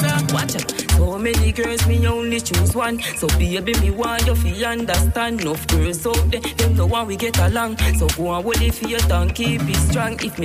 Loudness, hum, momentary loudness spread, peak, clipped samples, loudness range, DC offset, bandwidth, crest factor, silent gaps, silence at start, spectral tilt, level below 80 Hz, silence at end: -19 LUFS; none; 3 LU; -4 dBFS; under 0.1%; 1 LU; under 0.1%; 16 kHz; 14 dB; none; 0 s; -4.5 dB/octave; -24 dBFS; 0 s